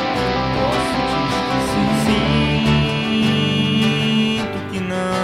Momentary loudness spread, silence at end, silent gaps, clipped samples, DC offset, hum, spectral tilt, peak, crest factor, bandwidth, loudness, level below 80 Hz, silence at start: 5 LU; 0 s; none; under 0.1%; under 0.1%; none; -5.5 dB/octave; -4 dBFS; 14 dB; 15 kHz; -18 LUFS; -34 dBFS; 0 s